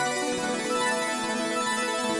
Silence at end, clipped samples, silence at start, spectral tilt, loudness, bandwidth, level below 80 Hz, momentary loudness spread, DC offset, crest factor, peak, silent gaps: 0 s; under 0.1%; 0 s; -2 dB/octave; -27 LUFS; 11.5 kHz; -66 dBFS; 2 LU; under 0.1%; 14 dB; -14 dBFS; none